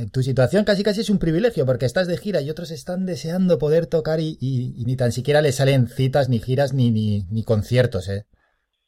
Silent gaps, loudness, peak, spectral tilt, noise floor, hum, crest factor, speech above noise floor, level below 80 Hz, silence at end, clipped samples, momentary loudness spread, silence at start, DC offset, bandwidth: none; -21 LUFS; -6 dBFS; -7 dB/octave; -68 dBFS; none; 14 dB; 48 dB; -46 dBFS; 0.65 s; under 0.1%; 8 LU; 0 s; under 0.1%; 15 kHz